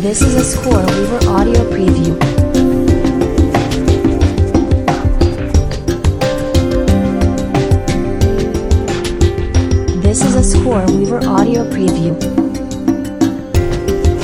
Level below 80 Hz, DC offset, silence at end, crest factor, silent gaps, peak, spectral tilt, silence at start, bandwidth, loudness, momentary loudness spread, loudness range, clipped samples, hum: -18 dBFS; under 0.1%; 0 s; 12 dB; none; 0 dBFS; -6 dB/octave; 0 s; 16 kHz; -13 LUFS; 4 LU; 2 LU; under 0.1%; none